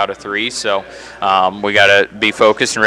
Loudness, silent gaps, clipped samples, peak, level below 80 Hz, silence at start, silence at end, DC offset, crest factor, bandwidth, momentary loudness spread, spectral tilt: -13 LUFS; none; under 0.1%; 0 dBFS; -52 dBFS; 0 s; 0 s; under 0.1%; 14 dB; 14.5 kHz; 10 LU; -2.5 dB/octave